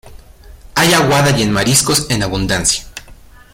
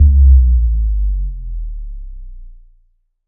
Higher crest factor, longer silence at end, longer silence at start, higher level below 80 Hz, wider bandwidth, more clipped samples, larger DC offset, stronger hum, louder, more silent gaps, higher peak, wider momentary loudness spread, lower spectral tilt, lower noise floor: about the same, 16 dB vs 12 dB; second, 0.4 s vs 0.75 s; about the same, 0.05 s vs 0 s; second, -34 dBFS vs -14 dBFS; first, 16.5 kHz vs 0.3 kHz; neither; neither; neither; about the same, -13 LUFS vs -14 LUFS; neither; about the same, 0 dBFS vs 0 dBFS; second, 10 LU vs 24 LU; second, -3.5 dB/octave vs -21 dB/octave; second, -39 dBFS vs -56 dBFS